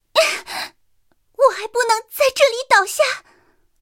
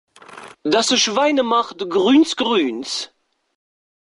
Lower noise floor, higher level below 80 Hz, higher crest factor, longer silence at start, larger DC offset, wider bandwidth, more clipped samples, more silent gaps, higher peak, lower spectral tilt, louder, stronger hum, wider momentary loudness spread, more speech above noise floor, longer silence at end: first, -65 dBFS vs -40 dBFS; about the same, -64 dBFS vs -64 dBFS; about the same, 20 dB vs 16 dB; second, 0.15 s vs 0.3 s; neither; first, 17 kHz vs 11.5 kHz; neither; neither; first, 0 dBFS vs -4 dBFS; second, 1 dB/octave vs -2.5 dB/octave; about the same, -17 LUFS vs -17 LUFS; neither; first, 14 LU vs 11 LU; first, 48 dB vs 23 dB; second, 0.6 s vs 1.05 s